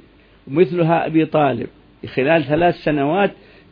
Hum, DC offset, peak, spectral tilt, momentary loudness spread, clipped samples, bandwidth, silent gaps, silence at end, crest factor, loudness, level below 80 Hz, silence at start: none; under 0.1%; -2 dBFS; -10 dB/octave; 11 LU; under 0.1%; 5.2 kHz; none; 0.4 s; 16 dB; -18 LUFS; -48 dBFS; 0.45 s